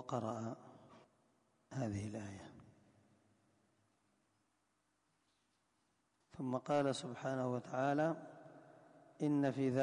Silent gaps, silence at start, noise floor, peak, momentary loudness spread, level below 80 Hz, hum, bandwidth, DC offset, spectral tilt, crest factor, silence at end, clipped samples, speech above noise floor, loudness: none; 0 s; -82 dBFS; -24 dBFS; 21 LU; -74 dBFS; none; 10.5 kHz; under 0.1%; -6.5 dB/octave; 18 dB; 0 s; under 0.1%; 43 dB; -40 LUFS